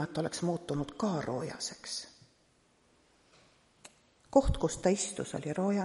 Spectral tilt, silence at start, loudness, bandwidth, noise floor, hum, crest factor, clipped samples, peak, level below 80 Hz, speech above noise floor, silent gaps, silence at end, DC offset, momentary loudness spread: -5 dB/octave; 0 s; -33 LUFS; 11.5 kHz; -69 dBFS; none; 24 dB; under 0.1%; -10 dBFS; -46 dBFS; 36 dB; none; 0 s; under 0.1%; 11 LU